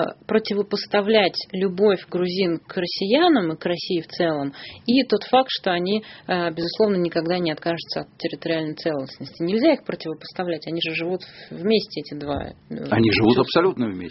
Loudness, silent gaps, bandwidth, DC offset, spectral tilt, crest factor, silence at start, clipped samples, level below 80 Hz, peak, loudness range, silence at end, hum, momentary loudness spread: -22 LUFS; none; 6 kHz; under 0.1%; -4 dB/octave; 20 dB; 0 s; under 0.1%; -56 dBFS; -2 dBFS; 4 LU; 0 s; none; 12 LU